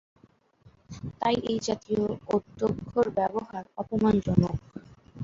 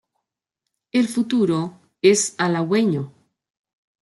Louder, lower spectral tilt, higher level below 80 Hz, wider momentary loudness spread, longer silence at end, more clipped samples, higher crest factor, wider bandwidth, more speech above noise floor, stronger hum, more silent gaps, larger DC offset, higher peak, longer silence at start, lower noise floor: second, -28 LUFS vs -20 LUFS; first, -7 dB/octave vs -4.5 dB/octave; first, -50 dBFS vs -68 dBFS; first, 17 LU vs 10 LU; second, 0 s vs 0.95 s; neither; first, 24 dB vs 18 dB; second, 7.6 kHz vs 12 kHz; second, 34 dB vs 63 dB; neither; neither; neither; about the same, -4 dBFS vs -4 dBFS; about the same, 0.9 s vs 0.95 s; second, -61 dBFS vs -82 dBFS